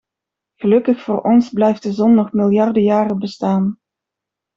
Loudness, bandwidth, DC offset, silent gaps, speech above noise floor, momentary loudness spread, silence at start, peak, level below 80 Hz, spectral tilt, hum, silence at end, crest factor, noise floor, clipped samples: -16 LUFS; 7.4 kHz; under 0.1%; none; 69 dB; 6 LU; 0.6 s; -2 dBFS; -60 dBFS; -8.5 dB/octave; none; 0.8 s; 14 dB; -84 dBFS; under 0.1%